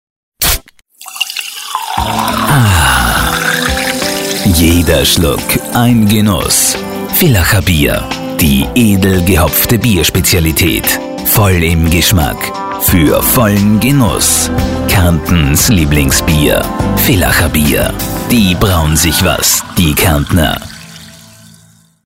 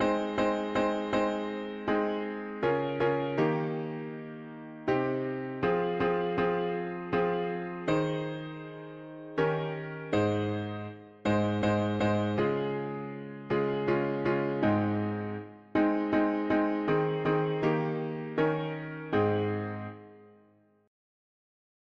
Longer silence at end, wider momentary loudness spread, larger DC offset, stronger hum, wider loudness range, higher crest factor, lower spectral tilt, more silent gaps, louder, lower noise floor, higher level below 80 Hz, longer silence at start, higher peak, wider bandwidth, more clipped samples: second, 0.9 s vs 1.55 s; second, 7 LU vs 11 LU; neither; neither; about the same, 2 LU vs 4 LU; second, 10 dB vs 16 dB; second, -4 dB/octave vs -8 dB/octave; neither; first, -10 LUFS vs -30 LUFS; second, -45 dBFS vs -63 dBFS; first, -22 dBFS vs -60 dBFS; first, 0.4 s vs 0 s; first, 0 dBFS vs -14 dBFS; first, 16.5 kHz vs 7.4 kHz; neither